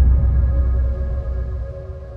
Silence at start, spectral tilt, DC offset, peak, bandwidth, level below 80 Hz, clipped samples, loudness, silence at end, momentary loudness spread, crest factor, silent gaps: 0 s; -11 dB/octave; under 0.1%; -6 dBFS; 1.8 kHz; -18 dBFS; under 0.1%; -21 LUFS; 0 s; 13 LU; 12 dB; none